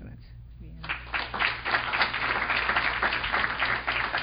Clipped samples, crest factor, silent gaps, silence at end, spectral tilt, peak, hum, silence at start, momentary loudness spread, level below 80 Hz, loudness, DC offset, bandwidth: under 0.1%; 20 dB; none; 0 s; -7.5 dB/octave; -8 dBFS; none; 0 s; 13 LU; -46 dBFS; -26 LUFS; under 0.1%; 5.4 kHz